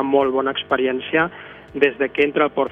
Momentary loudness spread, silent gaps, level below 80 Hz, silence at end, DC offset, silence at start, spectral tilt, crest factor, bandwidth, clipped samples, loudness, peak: 6 LU; none; -56 dBFS; 0 s; under 0.1%; 0 s; -7 dB/octave; 18 dB; 3.9 kHz; under 0.1%; -20 LUFS; -2 dBFS